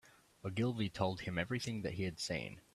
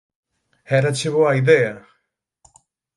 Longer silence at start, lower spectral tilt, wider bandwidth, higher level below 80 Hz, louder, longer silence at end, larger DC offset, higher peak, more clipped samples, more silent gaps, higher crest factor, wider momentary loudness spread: second, 0.05 s vs 0.7 s; about the same, -5.5 dB/octave vs -5.5 dB/octave; first, 13.5 kHz vs 11.5 kHz; about the same, -64 dBFS vs -62 dBFS; second, -39 LUFS vs -18 LUFS; second, 0.15 s vs 1.15 s; neither; second, -18 dBFS vs 0 dBFS; neither; neither; about the same, 22 dB vs 20 dB; second, 5 LU vs 9 LU